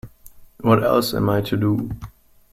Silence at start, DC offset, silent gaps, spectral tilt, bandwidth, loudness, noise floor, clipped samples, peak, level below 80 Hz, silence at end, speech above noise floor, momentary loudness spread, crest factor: 0.05 s; under 0.1%; none; -6.5 dB/octave; 16.5 kHz; -20 LUFS; -45 dBFS; under 0.1%; -4 dBFS; -46 dBFS; 0.45 s; 26 dB; 11 LU; 18 dB